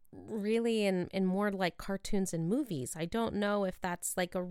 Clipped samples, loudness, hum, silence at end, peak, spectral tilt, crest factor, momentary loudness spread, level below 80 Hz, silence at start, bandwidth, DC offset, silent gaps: under 0.1%; -34 LUFS; none; 0 s; -18 dBFS; -5 dB/octave; 16 dB; 6 LU; -54 dBFS; 0.1 s; 16.5 kHz; under 0.1%; none